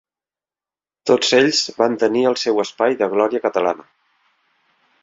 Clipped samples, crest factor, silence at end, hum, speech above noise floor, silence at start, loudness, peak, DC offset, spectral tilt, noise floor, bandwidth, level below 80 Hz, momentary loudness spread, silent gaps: under 0.1%; 18 dB; 1.25 s; none; over 73 dB; 1.05 s; -18 LUFS; -2 dBFS; under 0.1%; -3 dB/octave; under -90 dBFS; 7.8 kHz; -64 dBFS; 7 LU; none